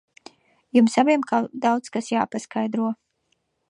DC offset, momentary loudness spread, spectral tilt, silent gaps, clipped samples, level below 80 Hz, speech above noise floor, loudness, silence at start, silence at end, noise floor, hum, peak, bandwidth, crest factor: under 0.1%; 9 LU; -5 dB/octave; none; under 0.1%; -74 dBFS; 50 dB; -22 LUFS; 0.75 s; 0.75 s; -72 dBFS; none; -4 dBFS; 10.5 kHz; 18 dB